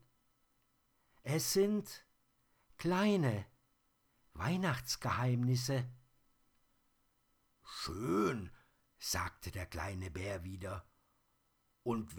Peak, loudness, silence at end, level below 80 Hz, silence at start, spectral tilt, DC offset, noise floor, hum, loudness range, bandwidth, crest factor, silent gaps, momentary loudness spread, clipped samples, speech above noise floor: -20 dBFS; -37 LUFS; 0 s; -62 dBFS; 1.25 s; -5 dB/octave; under 0.1%; -77 dBFS; none; 6 LU; over 20 kHz; 18 dB; none; 15 LU; under 0.1%; 41 dB